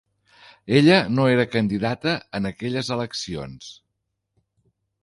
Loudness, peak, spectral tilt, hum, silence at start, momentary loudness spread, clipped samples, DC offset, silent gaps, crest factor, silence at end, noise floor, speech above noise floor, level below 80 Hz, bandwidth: -21 LUFS; -4 dBFS; -6 dB/octave; none; 0.65 s; 20 LU; under 0.1%; under 0.1%; none; 20 dB; 1.3 s; -78 dBFS; 57 dB; -54 dBFS; 11.5 kHz